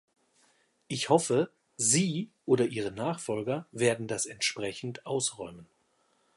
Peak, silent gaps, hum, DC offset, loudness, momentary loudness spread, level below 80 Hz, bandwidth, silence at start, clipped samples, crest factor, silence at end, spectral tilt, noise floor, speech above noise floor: -8 dBFS; none; none; under 0.1%; -30 LUFS; 11 LU; -70 dBFS; 11.5 kHz; 0.9 s; under 0.1%; 22 dB; 0.75 s; -3.5 dB/octave; -71 dBFS; 41 dB